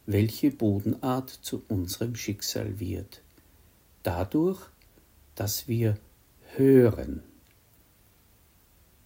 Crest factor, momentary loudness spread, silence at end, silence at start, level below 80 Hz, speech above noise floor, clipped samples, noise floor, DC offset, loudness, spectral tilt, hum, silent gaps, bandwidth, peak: 20 dB; 18 LU; 1.85 s; 0.05 s; -54 dBFS; 34 dB; under 0.1%; -61 dBFS; under 0.1%; -28 LUFS; -6 dB/octave; none; none; 16.5 kHz; -8 dBFS